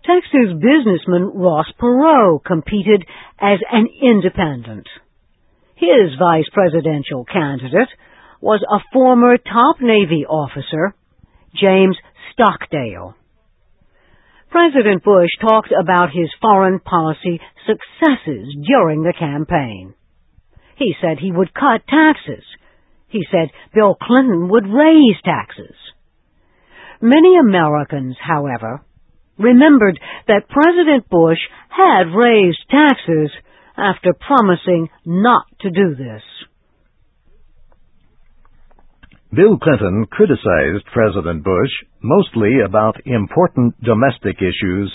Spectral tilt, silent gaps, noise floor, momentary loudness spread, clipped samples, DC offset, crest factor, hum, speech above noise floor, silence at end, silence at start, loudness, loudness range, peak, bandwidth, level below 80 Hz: -10 dB/octave; none; -57 dBFS; 12 LU; under 0.1%; under 0.1%; 14 dB; none; 44 dB; 0 s; 0.05 s; -14 LUFS; 5 LU; 0 dBFS; 4 kHz; -44 dBFS